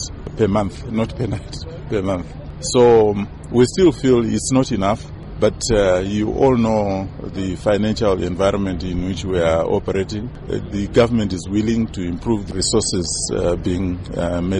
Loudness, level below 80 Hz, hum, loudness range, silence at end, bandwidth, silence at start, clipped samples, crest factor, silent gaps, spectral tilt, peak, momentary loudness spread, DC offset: -19 LUFS; -34 dBFS; none; 3 LU; 0 s; 11.5 kHz; 0 s; under 0.1%; 14 dB; none; -5.5 dB/octave; -4 dBFS; 11 LU; under 0.1%